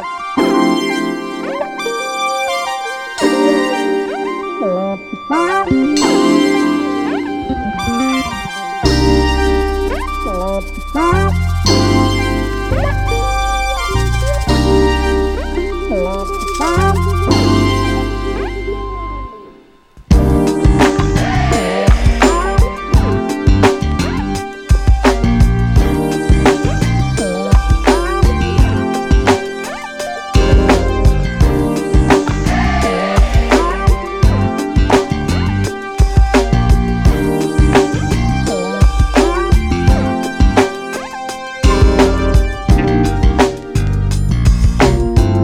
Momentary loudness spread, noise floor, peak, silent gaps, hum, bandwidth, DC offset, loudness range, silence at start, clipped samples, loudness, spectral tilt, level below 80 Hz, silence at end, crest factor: 8 LU; -42 dBFS; 0 dBFS; none; none; 14.5 kHz; under 0.1%; 3 LU; 0 s; under 0.1%; -14 LUFS; -6 dB/octave; -18 dBFS; 0 s; 12 dB